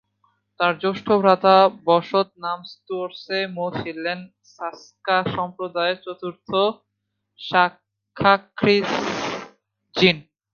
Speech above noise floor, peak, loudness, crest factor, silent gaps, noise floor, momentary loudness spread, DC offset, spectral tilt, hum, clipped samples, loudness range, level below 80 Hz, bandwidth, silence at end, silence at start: 56 dB; 0 dBFS; -21 LUFS; 22 dB; none; -77 dBFS; 16 LU; under 0.1%; -5.5 dB/octave; none; under 0.1%; 6 LU; -60 dBFS; 7 kHz; 0.35 s; 0.6 s